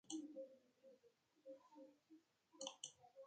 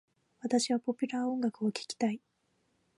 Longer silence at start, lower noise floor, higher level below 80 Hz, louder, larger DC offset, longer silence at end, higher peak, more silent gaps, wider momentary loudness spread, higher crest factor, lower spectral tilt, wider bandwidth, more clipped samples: second, 0.05 s vs 0.45 s; about the same, -78 dBFS vs -76 dBFS; second, under -90 dBFS vs -84 dBFS; second, -57 LUFS vs -33 LUFS; neither; second, 0 s vs 0.8 s; second, -32 dBFS vs -16 dBFS; neither; first, 14 LU vs 6 LU; first, 28 dB vs 18 dB; second, -1.5 dB/octave vs -4 dB/octave; second, 9 kHz vs 11.5 kHz; neither